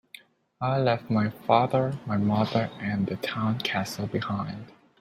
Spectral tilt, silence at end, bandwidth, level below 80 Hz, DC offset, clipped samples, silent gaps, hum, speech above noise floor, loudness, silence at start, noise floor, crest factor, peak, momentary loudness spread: -6.5 dB/octave; 0.3 s; 15.5 kHz; -62 dBFS; under 0.1%; under 0.1%; none; none; 26 dB; -27 LUFS; 0.6 s; -52 dBFS; 22 dB; -6 dBFS; 8 LU